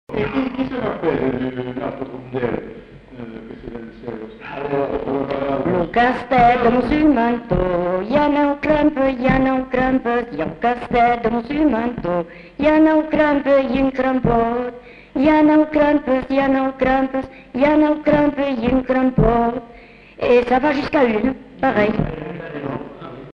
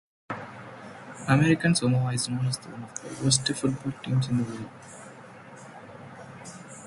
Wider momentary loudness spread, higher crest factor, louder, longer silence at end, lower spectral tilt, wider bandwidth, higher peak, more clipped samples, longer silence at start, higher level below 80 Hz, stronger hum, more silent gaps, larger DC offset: second, 15 LU vs 22 LU; second, 14 dB vs 22 dB; first, -18 LUFS vs -26 LUFS; about the same, 0.05 s vs 0 s; first, -8.5 dB/octave vs -4.5 dB/octave; second, 6.2 kHz vs 11.5 kHz; about the same, -4 dBFS vs -6 dBFS; neither; second, 0.1 s vs 0.3 s; first, -38 dBFS vs -60 dBFS; neither; neither; neither